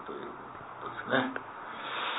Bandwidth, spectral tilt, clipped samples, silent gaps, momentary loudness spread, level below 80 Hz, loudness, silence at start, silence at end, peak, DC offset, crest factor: 4.1 kHz; -7.5 dB/octave; under 0.1%; none; 13 LU; -72 dBFS; -36 LUFS; 0 s; 0 s; -14 dBFS; under 0.1%; 22 dB